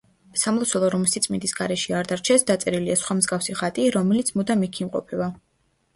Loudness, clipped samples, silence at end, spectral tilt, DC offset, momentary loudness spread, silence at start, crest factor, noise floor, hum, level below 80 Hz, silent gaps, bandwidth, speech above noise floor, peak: -22 LUFS; under 0.1%; 0.6 s; -4 dB/octave; under 0.1%; 8 LU; 0.35 s; 18 dB; -68 dBFS; none; -60 dBFS; none; 11.5 kHz; 45 dB; -6 dBFS